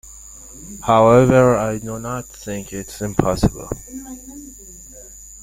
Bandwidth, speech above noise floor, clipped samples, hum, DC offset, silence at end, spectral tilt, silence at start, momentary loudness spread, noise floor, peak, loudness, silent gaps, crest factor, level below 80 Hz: 16.5 kHz; 22 dB; under 0.1%; none; under 0.1%; 0.05 s; -6.5 dB/octave; 0.05 s; 26 LU; -40 dBFS; -2 dBFS; -17 LUFS; none; 18 dB; -38 dBFS